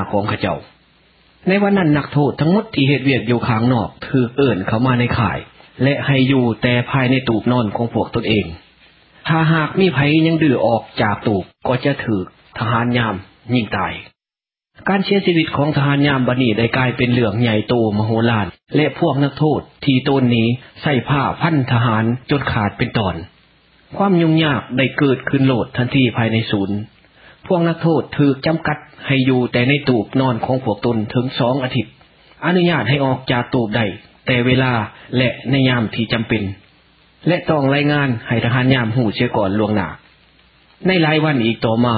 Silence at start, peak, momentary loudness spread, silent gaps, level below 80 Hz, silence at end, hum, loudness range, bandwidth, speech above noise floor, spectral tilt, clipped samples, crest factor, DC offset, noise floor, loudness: 0 s; 0 dBFS; 7 LU; none; -44 dBFS; 0 s; none; 2 LU; 5 kHz; over 74 dB; -12 dB/octave; under 0.1%; 16 dB; under 0.1%; under -90 dBFS; -17 LUFS